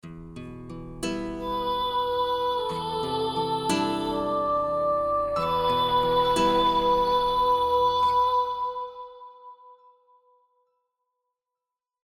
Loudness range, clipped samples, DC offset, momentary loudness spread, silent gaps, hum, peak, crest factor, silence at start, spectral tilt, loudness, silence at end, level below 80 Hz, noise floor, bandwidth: 7 LU; under 0.1%; under 0.1%; 18 LU; none; none; -12 dBFS; 14 dB; 0.05 s; -4.5 dB/octave; -25 LUFS; 2.3 s; -50 dBFS; -88 dBFS; 14 kHz